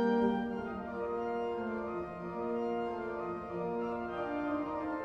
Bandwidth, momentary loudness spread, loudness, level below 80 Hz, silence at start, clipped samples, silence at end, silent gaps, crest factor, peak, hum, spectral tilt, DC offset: 6.6 kHz; 6 LU; -36 LUFS; -62 dBFS; 0 s; under 0.1%; 0 s; none; 16 dB; -18 dBFS; none; -8 dB/octave; under 0.1%